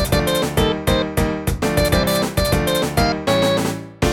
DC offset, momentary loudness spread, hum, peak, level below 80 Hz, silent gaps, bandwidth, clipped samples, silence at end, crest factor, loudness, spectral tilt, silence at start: under 0.1%; 4 LU; none; -2 dBFS; -28 dBFS; none; 19 kHz; under 0.1%; 0 s; 16 dB; -18 LUFS; -5 dB/octave; 0 s